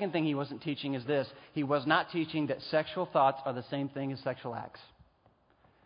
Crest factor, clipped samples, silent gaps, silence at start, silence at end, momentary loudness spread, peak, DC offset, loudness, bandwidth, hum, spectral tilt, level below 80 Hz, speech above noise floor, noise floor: 22 dB; under 0.1%; none; 0 s; 1 s; 10 LU; -12 dBFS; under 0.1%; -33 LUFS; 5.2 kHz; none; -4 dB/octave; -72 dBFS; 35 dB; -68 dBFS